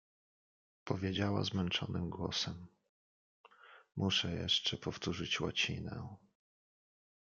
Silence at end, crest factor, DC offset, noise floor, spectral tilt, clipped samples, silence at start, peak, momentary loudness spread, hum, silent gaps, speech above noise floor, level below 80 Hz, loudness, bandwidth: 1.15 s; 22 dB; under 0.1%; under -90 dBFS; -4.5 dB/octave; under 0.1%; 0.85 s; -18 dBFS; 14 LU; none; 2.89-3.44 s; over 53 dB; -68 dBFS; -36 LUFS; 7.6 kHz